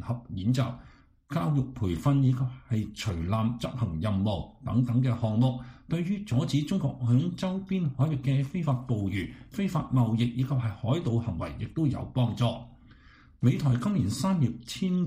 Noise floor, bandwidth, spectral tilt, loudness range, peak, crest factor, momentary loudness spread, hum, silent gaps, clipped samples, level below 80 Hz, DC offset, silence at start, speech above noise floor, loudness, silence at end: -55 dBFS; 14.5 kHz; -7.5 dB/octave; 1 LU; -12 dBFS; 16 dB; 7 LU; none; none; under 0.1%; -50 dBFS; under 0.1%; 0 s; 27 dB; -29 LUFS; 0 s